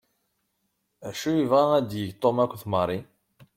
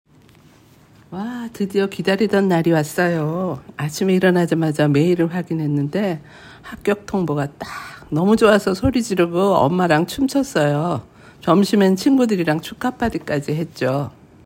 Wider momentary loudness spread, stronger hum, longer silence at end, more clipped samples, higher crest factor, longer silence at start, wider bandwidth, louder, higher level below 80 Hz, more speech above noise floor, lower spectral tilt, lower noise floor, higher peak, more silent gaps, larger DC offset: about the same, 14 LU vs 12 LU; neither; first, 0.55 s vs 0.35 s; neither; about the same, 18 dB vs 18 dB; about the same, 1 s vs 1.1 s; about the same, 16.5 kHz vs 16.5 kHz; second, -25 LUFS vs -19 LUFS; second, -64 dBFS vs -48 dBFS; first, 52 dB vs 31 dB; about the same, -6.5 dB/octave vs -6.5 dB/octave; first, -76 dBFS vs -49 dBFS; second, -8 dBFS vs 0 dBFS; neither; neither